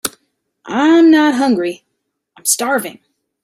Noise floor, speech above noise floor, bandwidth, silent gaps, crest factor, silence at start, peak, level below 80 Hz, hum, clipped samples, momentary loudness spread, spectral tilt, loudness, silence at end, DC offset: -72 dBFS; 59 dB; 16 kHz; none; 16 dB; 0.05 s; 0 dBFS; -64 dBFS; none; under 0.1%; 16 LU; -3 dB/octave; -13 LUFS; 0.5 s; under 0.1%